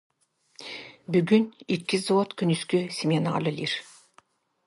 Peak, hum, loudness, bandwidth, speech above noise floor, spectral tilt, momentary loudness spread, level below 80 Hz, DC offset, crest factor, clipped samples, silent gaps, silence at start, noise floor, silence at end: -8 dBFS; none; -26 LUFS; 11.5 kHz; 37 dB; -6 dB/octave; 16 LU; -70 dBFS; under 0.1%; 18 dB; under 0.1%; none; 0.6 s; -62 dBFS; 0.85 s